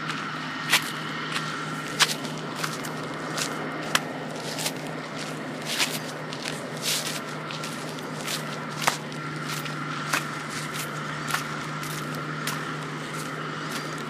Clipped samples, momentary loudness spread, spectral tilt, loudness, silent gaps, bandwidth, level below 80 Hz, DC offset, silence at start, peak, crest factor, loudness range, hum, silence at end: under 0.1%; 10 LU; -3 dB/octave; -29 LUFS; none; 16 kHz; -68 dBFS; under 0.1%; 0 s; -2 dBFS; 28 dB; 3 LU; none; 0 s